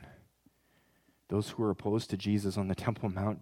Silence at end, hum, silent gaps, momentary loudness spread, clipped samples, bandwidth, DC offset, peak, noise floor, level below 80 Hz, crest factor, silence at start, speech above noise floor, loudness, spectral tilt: 0 s; none; none; 3 LU; under 0.1%; 15.5 kHz; under 0.1%; -14 dBFS; -70 dBFS; -66 dBFS; 20 dB; 0 s; 38 dB; -34 LUFS; -7 dB/octave